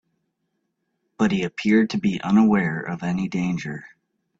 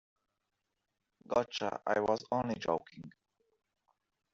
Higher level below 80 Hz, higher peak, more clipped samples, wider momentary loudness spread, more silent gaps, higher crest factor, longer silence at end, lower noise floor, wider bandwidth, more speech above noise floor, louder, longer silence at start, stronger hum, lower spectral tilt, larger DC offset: first, -58 dBFS vs -72 dBFS; first, -6 dBFS vs -16 dBFS; neither; second, 10 LU vs 20 LU; neither; second, 16 dB vs 22 dB; second, 0.55 s vs 1.25 s; second, -75 dBFS vs -85 dBFS; about the same, 7.8 kHz vs 7.6 kHz; about the same, 54 dB vs 51 dB; first, -22 LUFS vs -35 LUFS; about the same, 1.2 s vs 1.3 s; neither; first, -7 dB/octave vs -3.5 dB/octave; neither